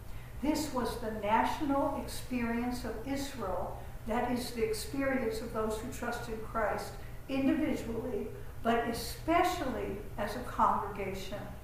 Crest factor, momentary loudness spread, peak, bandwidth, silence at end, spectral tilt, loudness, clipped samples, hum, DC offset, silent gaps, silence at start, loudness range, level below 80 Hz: 20 dB; 10 LU; -14 dBFS; 15.5 kHz; 0 s; -5 dB/octave; -34 LUFS; under 0.1%; none; under 0.1%; none; 0 s; 2 LU; -48 dBFS